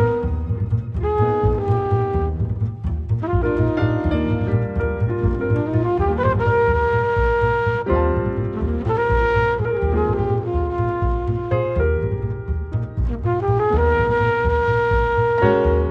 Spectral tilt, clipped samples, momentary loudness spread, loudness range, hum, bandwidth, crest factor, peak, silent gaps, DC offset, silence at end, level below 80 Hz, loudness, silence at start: -9.5 dB/octave; under 0.1%; 6 LU; 3 LU; none; 6 kHz; 16 dB; -4 dBFS; none; under 0.1%; 0 s; -28 dBFS; -20 LUFS; 0 s